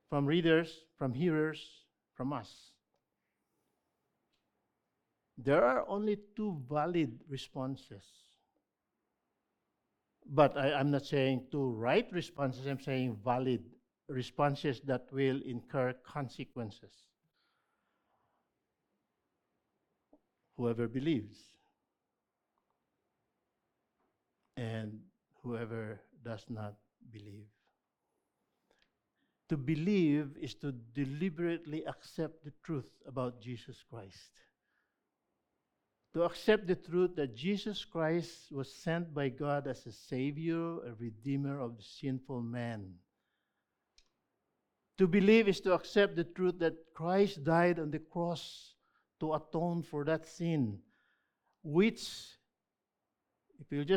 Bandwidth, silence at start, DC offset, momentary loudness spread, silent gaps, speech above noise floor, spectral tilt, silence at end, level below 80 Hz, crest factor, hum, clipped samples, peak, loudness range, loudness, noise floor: 14 kHz; 0.1 s; under 0.1%; 17 LU; none; 55 dB; -7 dB/octave; 0 s; -68 dBFS; 26 dB; none; under 0.1%; -12 dBFS; 14 LU; -35 LUFS; -90 dBFS